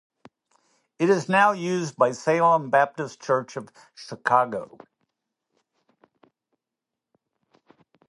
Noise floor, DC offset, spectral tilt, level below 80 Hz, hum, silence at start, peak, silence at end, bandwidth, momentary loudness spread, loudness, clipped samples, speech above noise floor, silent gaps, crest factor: -87 dBFS; under 0.1%; -5.5 dB/octave; -76 dBFS; none; 1 s; -4 dBFS; 3.45 s; 11.5 kHz; 18 LU; -23 LUFS; under 0.1%; 64 dB; none; 22 dB